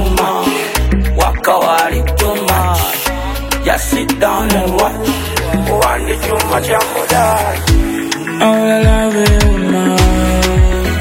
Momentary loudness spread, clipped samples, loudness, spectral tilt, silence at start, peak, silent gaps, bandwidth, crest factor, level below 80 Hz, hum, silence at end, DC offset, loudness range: 5 LU; under 0.1%; -13 LUFS; -4.5 dB/octave; 0 s; 0 dBFS; none; 16.5 kHz; 12 dB; -18 dBFS; none; 0 s; under 0.1%; 2 LU